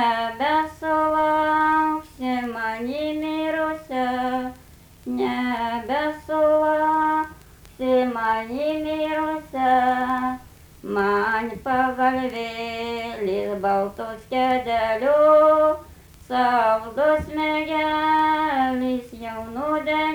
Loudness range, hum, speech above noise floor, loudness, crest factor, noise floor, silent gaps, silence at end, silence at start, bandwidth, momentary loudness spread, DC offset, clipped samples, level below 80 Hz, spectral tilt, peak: 5 LU; none; 27 dB; -22 LUFS; 16 dB; -48 dBFS; none; 0 s; 0 s; over 20 kHz; 10 LU; under 0.1%; under 0.1%; -50 dBFS; -5.5 dB/octave; -6 dBFS